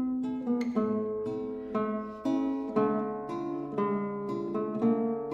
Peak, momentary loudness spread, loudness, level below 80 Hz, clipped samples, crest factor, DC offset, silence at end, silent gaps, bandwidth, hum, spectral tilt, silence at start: -16 dBFS; 6 LU; -31 LUFS; -64 dBFS; under 0.1%; 16 dB; under 0.1%; 0 s; none; 7.2 kHz; none; -8.5 dB/octave; 0 s